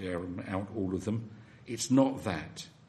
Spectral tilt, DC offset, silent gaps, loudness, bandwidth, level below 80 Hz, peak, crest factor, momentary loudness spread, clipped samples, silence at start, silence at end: -5.5 dB/octave; under 0.1%; none; -33 LUFS; 12.5 kHz; -62 dBFS; -12 dBFS; 22 dB; 17 LU; under 0.1%; 0 s; 0.05 s